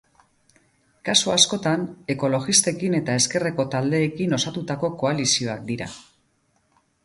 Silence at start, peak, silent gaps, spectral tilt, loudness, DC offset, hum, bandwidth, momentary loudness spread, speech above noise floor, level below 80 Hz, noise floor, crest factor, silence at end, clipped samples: 1.05 s; -2 dBFS; none; -3 dB/octave; -21 LUFS; under 0.1%; none; 11.5 kHz; 11 LU; 44 dB; -60 dBFS; -66 dBFS; 22 dB; 1.05 s; under 0.1%